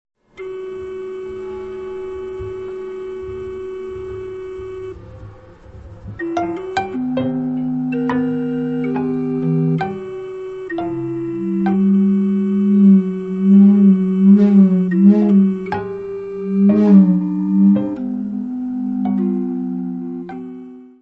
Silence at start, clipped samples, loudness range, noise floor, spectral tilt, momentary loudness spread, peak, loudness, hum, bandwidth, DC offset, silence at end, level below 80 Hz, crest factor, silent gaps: 0.4 s; under 0.1%; 16 LU; -39 dBFS; -10 dB/octave; 18 LU; -2 dBFS; -16 LUFS; none; 4.6 kHz; under 0.1%; 0.15 s; -50 dBFS; 16 dB; none